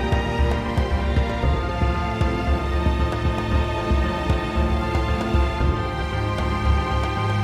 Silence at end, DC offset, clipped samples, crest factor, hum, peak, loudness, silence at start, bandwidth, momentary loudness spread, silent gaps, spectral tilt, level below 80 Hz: 0 s; under 0.1%; under 0.1%; 14 dB; none; -8 dBFS; -23 LUFS; 0 s; 10 kHz; 2 LU; none; -7 dB/octave; -24 dBFS